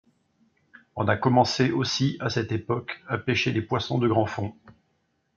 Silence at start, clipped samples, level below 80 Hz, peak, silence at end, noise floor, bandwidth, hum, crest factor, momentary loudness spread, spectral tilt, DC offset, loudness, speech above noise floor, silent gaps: 0.95 s; under 0.1%; -62 dBFS; -6 dBFS; 0.65 s; -72 dBFS; 7.6 kHz; none; 20 dB; 9 LU; -5.5 dB/octave; under 0.1%; -25 LUFS; 47 dB; none